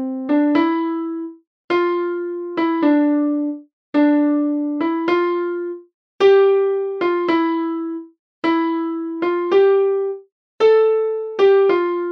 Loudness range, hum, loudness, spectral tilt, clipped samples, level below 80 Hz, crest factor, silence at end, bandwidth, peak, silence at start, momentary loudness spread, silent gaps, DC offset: 3 LU; none; -18 LUFS; -6 dB/octave; under 0.1%; -76 dBFS; 14 dB; 0 s; 6.2 kHz; -4 dBFS; 0 s; 12 LU; 1.47-1.68 s, 3.73-3.93 s, 5.94-6.19 s, 8.19-8.42 s, 10.32-10.58 s; under 0.1%